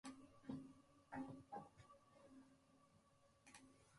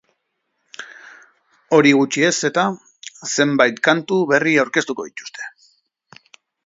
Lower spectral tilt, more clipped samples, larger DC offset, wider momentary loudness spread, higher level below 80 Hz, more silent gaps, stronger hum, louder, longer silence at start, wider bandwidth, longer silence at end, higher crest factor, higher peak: first, -5.5 dB/octave vs -4 dB/octave; neither; neither; second, 14 LU vs 21 LU; second, -84 dBFS vs -68 dBFS; neither; neither; second, -59 LUFS vs -17 LUFS; second, 0.05 s vs 0.8 s; first, 11 kHz vs 7.8 kHz; second, 0 s vs 1.15 s; about the same, 22 dB vs 20 dB; second, -38 dBFS vs 0 dBFS